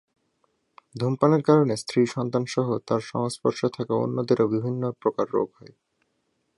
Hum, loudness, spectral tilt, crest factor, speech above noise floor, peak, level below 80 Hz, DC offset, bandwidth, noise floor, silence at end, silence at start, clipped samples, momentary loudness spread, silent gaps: none; -24 LUFS; -7 dB/octave; 20 dB; 49 dB; -4 dBFS; -68 dBFS; under 0.1%; 11.5 kHz; -73 dBFS; 1.1 s; 0.95 s; under 0.1%; 8 LU; none